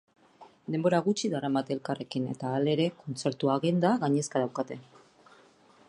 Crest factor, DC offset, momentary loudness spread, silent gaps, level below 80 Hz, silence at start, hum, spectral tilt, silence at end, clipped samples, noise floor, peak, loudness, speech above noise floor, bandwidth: 20 dB; under 0.1%; 9 LU; none; -74 dBFS; 0.4 s; none; -6 dB/octave; 1.05 s; under 0.1%; -59 dBFS; -10 dBFS; -29 LUFS; 31 dB; 11 kHz